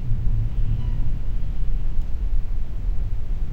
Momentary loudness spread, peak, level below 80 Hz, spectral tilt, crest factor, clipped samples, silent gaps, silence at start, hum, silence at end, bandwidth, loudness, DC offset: 4 LU; -8 dBFS; -22 dBFS; -8.5 dB/octave; 12 dB; under 0.1%; none; 0 s; none; 0 s; 3.1 kHz; -29 LUFS; 2%